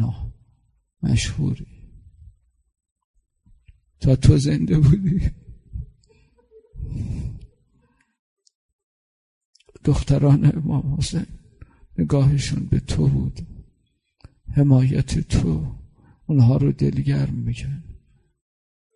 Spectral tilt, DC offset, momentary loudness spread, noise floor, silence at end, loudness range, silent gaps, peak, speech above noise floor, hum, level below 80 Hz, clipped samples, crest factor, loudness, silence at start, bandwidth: -7.5 dB/octave; under 0.1%; 21 LU; -67 dBFS; 1 s; 13 LU; 2.92-2.96 s, 3.04-3.14 s, 8.19-8.37 s, 8.55-9.53 s; -2 dBFS; 49 dB; none; -34 dBFS; under 0.1%; 20 dB; -20 LUFS; 0 s; 11 kHz